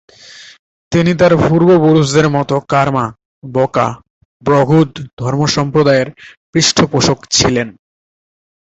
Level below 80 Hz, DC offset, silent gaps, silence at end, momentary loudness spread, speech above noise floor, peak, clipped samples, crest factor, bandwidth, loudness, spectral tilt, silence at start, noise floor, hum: -42 dBFS; under 0.1%; 0.59-0.91 s, 3.25-3.42 s, 4.10-4.40 s, 5.13-5.17 s, 6.37-6.53 s; 0.9 s; 10 LU; 26 dB; 0 dBFS; under 0.1%; 14 dB; 8.2 kHz; -13 LUFS; -5 dB/octave; 0.35 s; -38 dBFS; none